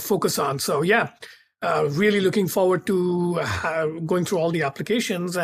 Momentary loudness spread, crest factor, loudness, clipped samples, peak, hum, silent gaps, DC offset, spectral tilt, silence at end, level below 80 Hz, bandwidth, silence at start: 5 LU; 16 dB; -22 LUFS; under 0.1%; -8 dBFS; none; none; under 0.1%; -5 dB/octave; 0 s; -58 dBFS; 15.5 kHz; 0 s